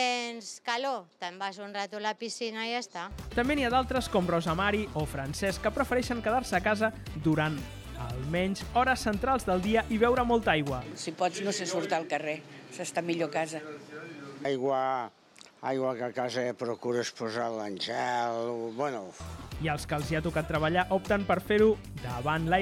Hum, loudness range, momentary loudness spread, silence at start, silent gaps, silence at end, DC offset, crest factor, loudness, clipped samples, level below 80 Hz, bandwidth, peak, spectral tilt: none; 5 LU; 12 LU; 0 s; none; 0 s; under 0.1%; 20 dB; -30 LUFS; under 0.1%; -48 dBFS; 16.5 kHz; -12 dBFS; -5 dB/octave